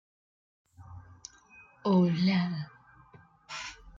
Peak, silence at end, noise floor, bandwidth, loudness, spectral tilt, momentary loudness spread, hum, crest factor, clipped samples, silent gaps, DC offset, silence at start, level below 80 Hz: -16 dBFS; 0.1 s; -58 dBFS; 7.6 kHz; -29 LUFS; -6.5 dB/octave; 25 LU; none; 18 dB; under 0.1%; none; under 0.1%; 0.8 s; -64 dBFS